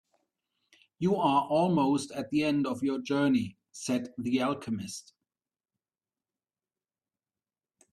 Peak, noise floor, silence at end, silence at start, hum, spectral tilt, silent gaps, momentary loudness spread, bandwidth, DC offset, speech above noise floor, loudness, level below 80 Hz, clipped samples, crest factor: -12 dBFS; under -90 dBFS; 2.9 s; 1 s; none; -6 dB/octave; none; 11 LU; 13 kHz; under 0.1%; over 62 dB; -29 LUFS; -70 dBFS; under 0.1%; 18 dB